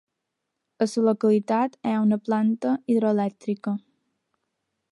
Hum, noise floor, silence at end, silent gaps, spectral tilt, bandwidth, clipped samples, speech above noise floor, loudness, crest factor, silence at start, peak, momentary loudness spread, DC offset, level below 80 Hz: none; -81 dBFS; 1.15 s; none; -7.5 dB/octave; 11 kHz; under 0.1%; 59 dB; -24 LUFS; 16 dB; 0.8 s; -10 dBFS; 8 LU; under 0.1%; -76 dBFS